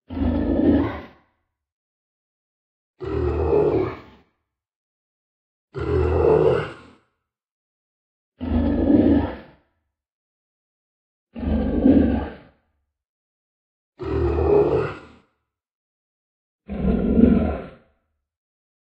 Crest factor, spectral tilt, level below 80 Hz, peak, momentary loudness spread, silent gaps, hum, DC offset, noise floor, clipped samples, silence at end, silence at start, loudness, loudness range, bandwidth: 22 dB; -10.5 dB/octave; -34 dBFS; -2 dBFS; 18 LU; 1.72-2.94 s, 4.76-5.68 s, 7.51-8.32 s, 10.12-11.27 s, 13.09-13.93 s, 15.71-16.59 s; none; under 0.1%; -75 dBFS; under 0.1%; 1.25 s; 0.1 s; -21 LUFS; 4 LU; 5.6 kHz